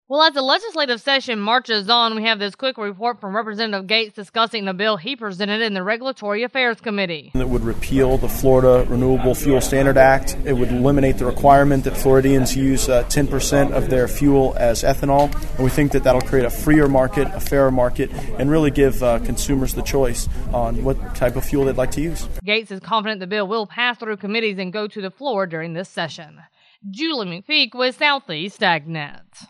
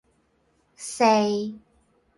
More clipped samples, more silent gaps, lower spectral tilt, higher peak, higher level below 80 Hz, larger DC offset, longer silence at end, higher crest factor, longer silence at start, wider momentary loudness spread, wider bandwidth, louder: neither; neither; about the same, -5 dB/octave vs -4 dB/octave; first, 0 dBFS vs -8 dBFS; first, -28 dBFS vs -68 dBFS; neither; second, 0.05 s vs 0.6 s; about the same, 18 dB vs 20 dB; second, 0.1 s vs 0.8 s; second, 10 LU vs 17 LU; first, 13.5 kHz vs 11.5 kHz; first, -19 LUFS vs -22 LUFS